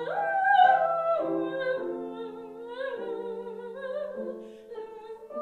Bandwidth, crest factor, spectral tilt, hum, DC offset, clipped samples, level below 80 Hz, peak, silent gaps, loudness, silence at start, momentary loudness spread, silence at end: 4.6 kHz; 20 dB; -6 dB/octave; none; under 0.1%; under 0.1%; -76 dBFS; -10 dBFS; none; -28 LUFS; 0 s; 21 LU; 0 s